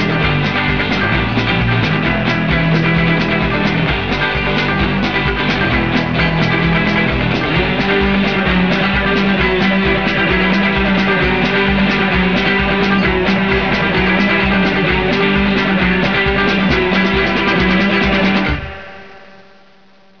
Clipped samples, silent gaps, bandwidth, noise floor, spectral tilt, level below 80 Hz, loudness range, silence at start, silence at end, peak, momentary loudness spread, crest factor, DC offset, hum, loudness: under 0.1%; none; 5.4 kHz; -48 dBFS; -7 dB/octave; -28 dBFS; 1 LU; 0 s; 0.95 s; 0 dBFS; 2 LU; 14 dB; 1%; none; -14 LUFS